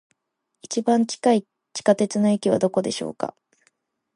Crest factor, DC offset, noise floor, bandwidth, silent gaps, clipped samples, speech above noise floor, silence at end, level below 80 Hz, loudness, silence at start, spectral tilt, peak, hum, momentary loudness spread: 20 dB; under 0.1%; -78 dBFS; 11.5 kHz; none; under 0.1%; 57 dB; 0.85 s; -68 dBFS; -22 LUFS; 0.7 s; -5 dB/octave; -4 dBFS; none; 10 LU